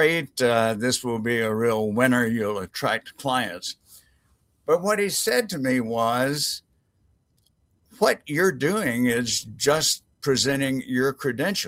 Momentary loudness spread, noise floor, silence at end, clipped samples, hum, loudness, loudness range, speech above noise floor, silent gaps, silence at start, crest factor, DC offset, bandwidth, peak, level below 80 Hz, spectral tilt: 6 LU; -66 dBFS; 0 s; under 0.1%; none; -23 LUFS; 3 LU; 43 dB; none; 0 s; 20 dB; under 0.1%; 16 kHz; -4 dBFS; -60 dBFS; -3.5 dB/octave